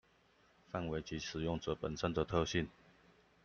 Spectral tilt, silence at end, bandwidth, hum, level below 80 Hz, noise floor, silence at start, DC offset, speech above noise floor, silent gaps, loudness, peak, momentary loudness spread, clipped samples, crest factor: -5.5 dB/octave; 0.75 s; 7.2 kHz; none; -58 dBFS; -70 dBFS; 0.7 s; under 0.1%; 32 dB; none; -39 LUFS; -20 dBFS; 8 LU; under 0.1%; 22 dB